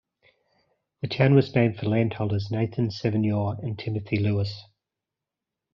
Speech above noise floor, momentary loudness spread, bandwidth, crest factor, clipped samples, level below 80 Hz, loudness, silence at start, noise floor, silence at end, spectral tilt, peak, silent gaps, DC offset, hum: 63 dB; 12 LU; 6.4 kHz; 20 dB; under 0.1%; -60 dBFS; -25 LUFS; 1.05 s; -87 dBFS; 1.1 s; -7 dB/octave; -6 dBFS; none; under 0.1%; none